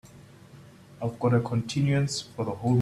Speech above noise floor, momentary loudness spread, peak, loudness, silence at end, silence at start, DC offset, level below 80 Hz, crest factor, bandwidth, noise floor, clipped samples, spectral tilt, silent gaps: 25 dB; 9 LU; -12 dBFS; -27 LUFS; 0 s; 0.15 s; under 0.1%; -58 dBFS; 16 dB; 12.5 kHz; -50 dBFS; under 0.1%; -6.5 dB/octave; none